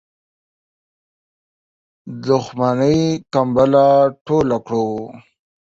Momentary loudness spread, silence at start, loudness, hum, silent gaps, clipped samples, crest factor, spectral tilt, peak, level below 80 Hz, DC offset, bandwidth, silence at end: 15 LU; 2.05 s; -16 LUFS; none; 4.21-4.25 s; under 0.1%; 16 dB; -7 dB/octave; -2 dBFS; -50 dBFS; under 0.1%; 7.8 kHz; 0.5 s